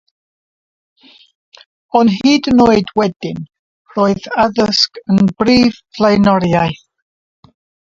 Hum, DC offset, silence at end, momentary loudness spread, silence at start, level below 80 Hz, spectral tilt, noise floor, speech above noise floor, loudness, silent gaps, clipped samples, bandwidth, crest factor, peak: none; under 0.1%; 1.2 s; 10 LU; 1.95 s; -44 dBFS; -6 dB/octave; under -90 dBFS; over 78 dB; -13 LUFS; 3.16-3.20 s, 3.59-3.85 s; under 0.1%; 7.6 kHz; 14 dB; 0 dBFS